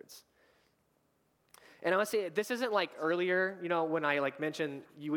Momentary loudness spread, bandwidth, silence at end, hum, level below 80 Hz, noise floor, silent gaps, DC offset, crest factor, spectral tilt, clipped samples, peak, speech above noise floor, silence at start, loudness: 8 LU; 19 kHz; 0 s; none; -88 dBFS; -75 dBFS; none; under 0.1%; 20 dB; -4.5 dB/octave; under 0.1%; -14 dBFS; 42 dB; 0.1 s; -33 LUFS